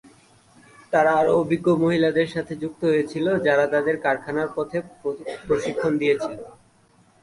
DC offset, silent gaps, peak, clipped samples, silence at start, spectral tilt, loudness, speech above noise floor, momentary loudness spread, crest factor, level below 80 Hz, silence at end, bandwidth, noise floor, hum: under 0.1%; none; -6 dBFS; under 0.1%; 0.9 s; -6.5 dB/octave; -22 LUFS; 36 dB; 11 LU; 16 dB; -58 dBFS; 0.75 s; 11.5 kHz; -58 dBFS; none